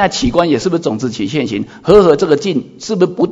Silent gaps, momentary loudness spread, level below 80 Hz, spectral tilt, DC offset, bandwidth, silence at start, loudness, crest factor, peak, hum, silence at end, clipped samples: none; 11 LU; -38 dBFS; -5.5 dB/octave; under 0.1%; 7.8 kHz; 0 s; -13 LUFS; 12 dB; 0 dBFS; none; 0 s; 0.5%